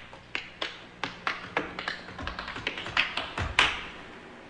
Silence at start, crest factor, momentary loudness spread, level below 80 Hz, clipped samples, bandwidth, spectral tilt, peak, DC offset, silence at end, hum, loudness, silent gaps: 0 s; 28 dB; 13 LU; -50 dBFS; under 0.1%; 11 kHz; -3 dB/octave; -6 dBFS; under 0.1%; 0 s; none; -31 LUFS; none